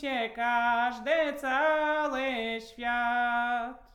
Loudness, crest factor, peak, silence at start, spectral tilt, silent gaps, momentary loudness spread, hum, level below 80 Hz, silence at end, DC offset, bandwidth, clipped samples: -29 LUFS; 14 dB; -14 dBFS; 0 s; -3 dB/octave; none; 6 LU; none; -60 dBFS; 0.15 s; under 0.1%; 16 kHz; under 0.1%